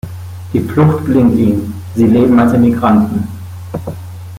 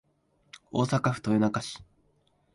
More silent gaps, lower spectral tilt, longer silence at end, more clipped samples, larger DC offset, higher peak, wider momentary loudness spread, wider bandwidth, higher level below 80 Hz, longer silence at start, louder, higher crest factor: neither; first, -9 dB/octave vs -6.5 dB/octave; second, 0 s vs 0.7 s; neither; neither; first, -2 dBFS vs -12 dBFS; first, 17 LU vs 12 LU; first, 15.5 kHz vs 11.5 kHz; first, -42 dBFS vs -62 dBFS; second, 0.05 s vs 0.75 s; first, -12 LUFS vs -28 LUFS; second, 10 dB vs 18 dB